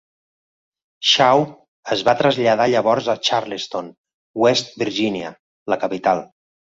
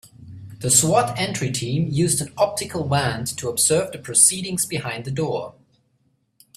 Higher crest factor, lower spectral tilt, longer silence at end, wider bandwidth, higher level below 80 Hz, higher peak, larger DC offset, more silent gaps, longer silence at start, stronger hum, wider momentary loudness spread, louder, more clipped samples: about the same, 18 dB vs 22 dB; about the same, -4 dB/octave vs -3.5 dB/octave; second, 0.4 s vs 1.05 s; second, 7.8 kHz vs 16 kHz; second, -62 dBFS vs -56 dBFS; about the same, -2 dBFS vs 0 dBFS; neither; first, 1.68-1.83 s, 3.98-4.04 s, 4.14-4.34 s, 5.39-5.66 s vs none; first, 1 s vs 0.2 s; neither; about the same, 14 LU vs 12 LU; about the same, -18 LUFS vs -20 LUFS; neither